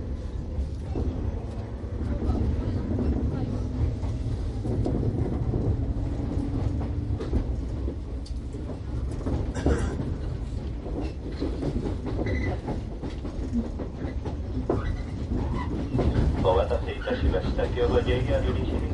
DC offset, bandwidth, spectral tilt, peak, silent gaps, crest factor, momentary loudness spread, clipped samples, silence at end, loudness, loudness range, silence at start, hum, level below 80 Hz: under 0.1%; 10.5 kHz; -8 dB/octave; -10 dBFS; none; 18 dB; 9 LU; under 0.1%; 0 s; -29 LUFS; 5 LU; 0 s; none; -30 dBFS